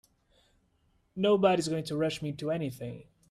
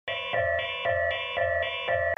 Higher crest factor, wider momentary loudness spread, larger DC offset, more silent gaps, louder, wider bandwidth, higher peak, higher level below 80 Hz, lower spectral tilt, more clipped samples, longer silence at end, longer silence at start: first, 20 dB vs 14 dB; first, 17 LU vs 1 LU; neither; neither; about the same, -29 LUFS vs -27 LUFS; first, 14.5 kHz vs 7 kHz; about the same, -12 dBFS vs -14 dBFS; second, -66 dBFS vs -54 dBFS; about the same, -6 dB/octave vs -5 dB/octave; neither; first, 0.3 s vs 0.05 s; first, 1.15 s vs 0.05 s